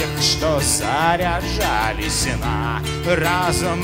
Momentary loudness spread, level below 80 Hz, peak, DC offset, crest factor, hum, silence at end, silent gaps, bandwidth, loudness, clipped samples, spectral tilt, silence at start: 5 LU; -30 dBFS; -2 dBFS; under 0.1%; 18 dB; none; 0 s; none; 16.5 kHz; -19 LUFS; under 0.1%; -3.5 dB/octave; 0 s